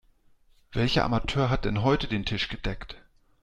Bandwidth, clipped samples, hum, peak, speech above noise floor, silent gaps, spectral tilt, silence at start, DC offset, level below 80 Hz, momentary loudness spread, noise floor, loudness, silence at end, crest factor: 9.8 kHz; under 0.1%; none; -10 dBFS; 34 dB; none; -6.5 dB/octave; 0.7 s; under 0.1%; -40 dBFS; 13 LU; -60 dBFS; -27 LUFS; 0.45 s; 18 dB